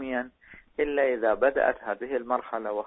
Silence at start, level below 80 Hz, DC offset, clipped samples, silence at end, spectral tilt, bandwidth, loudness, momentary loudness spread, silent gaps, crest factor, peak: 0 s; -58 dBFS; under 0.1%; under 0.1%; 0 s; -8.5 dB/octave; 4 kHz; -27 LUFS; 9 LU; none; 18 dB; -10 dBFS